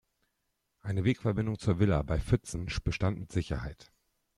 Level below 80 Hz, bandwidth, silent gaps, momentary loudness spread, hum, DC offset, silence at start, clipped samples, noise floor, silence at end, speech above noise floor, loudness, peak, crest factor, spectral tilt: -44 dBFS; 11.5 kHz; none; 9 LU; none; under 0.1%; 0.85 s; under 0.1%; -80 dBFS; 0.55 s; 50 dB; -32 LUFS; -14 dBFS; 18 dB; -7 dB/octave